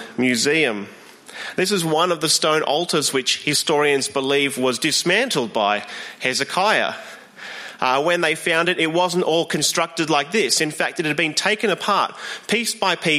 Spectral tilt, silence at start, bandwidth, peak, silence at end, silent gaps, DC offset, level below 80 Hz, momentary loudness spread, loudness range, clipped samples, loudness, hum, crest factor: -2.5 dB/octave; 0 s; 15.5 kHz; -2 dBFS; 0 s; none; under 0.1%; -68 dBFS; 10 LU; 2 LU; under 0.1%; -19 LUFS; none; 18 dB